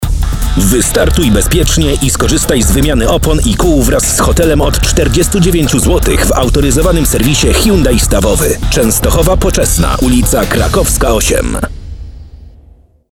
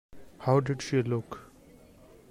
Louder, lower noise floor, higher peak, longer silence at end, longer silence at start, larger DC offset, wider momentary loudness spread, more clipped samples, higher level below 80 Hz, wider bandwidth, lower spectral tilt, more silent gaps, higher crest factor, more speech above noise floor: first, -10 LUFS vs -29 LUFS; second, -41 dBFS vs -55 dBFS; first, 0 dBFS vs -12 dBFS; second, 0.65 s vs 0.85 s; second, 0 s vs 0.15 s; first, 0.4% vs under 0.1%; second, 2 LU vs 16 LU; first, 0.3% vs under 0.1%; first, -14 dBFS vs -62 dBFS; first, 18.5 kHz vs 11.5 kHz; second, -4.5 dB/octave vs -7 dB/octave; neither; second, 10 dB vs 20 dB; first, 32 dB vs 27 dB